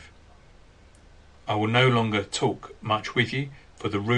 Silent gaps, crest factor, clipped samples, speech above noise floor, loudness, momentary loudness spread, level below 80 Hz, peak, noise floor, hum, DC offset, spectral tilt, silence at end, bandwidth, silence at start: none; 20 dB; under 0.1%; 28 dB; -25 LUFS; 15 LU; -56 dBFS; -6 dBFS; -52 dBFS; none; under 0.1%; -5.5 dB/octave; 0 s; 10 kHz; 0 s